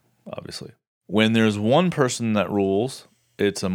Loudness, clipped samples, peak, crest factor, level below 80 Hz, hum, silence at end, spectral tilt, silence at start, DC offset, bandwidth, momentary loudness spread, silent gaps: -21 LUFS; under 0.1%; -4 dBFS; 20 dB; -66 dBFS; none; 0 s; -5.5 dB/octave; 0.25 s; under 0.1%; 15 kHz; 18 LU; 0.87-1.01 s